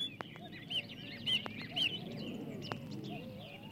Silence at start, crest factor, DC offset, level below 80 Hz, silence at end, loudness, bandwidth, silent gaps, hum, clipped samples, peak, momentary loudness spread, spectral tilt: 0 s; 24 dB; under 0.1%; -72 dBFS; 0 s; -39 LUFS; 16.5 kHz; none; none; under 0.1%; -18 dBFS; 13 LU; -4 dB/octave